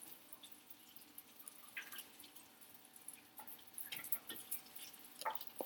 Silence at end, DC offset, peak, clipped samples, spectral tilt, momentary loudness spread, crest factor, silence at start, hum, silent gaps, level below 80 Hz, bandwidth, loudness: 0 s; under 0.1%; -18 dBFS; under 0.1%; -0.5 dB/octave; 15 LU; 32 dB; 0 s; none; none; under -90 dBFS; 19 kHz; -49 LUFS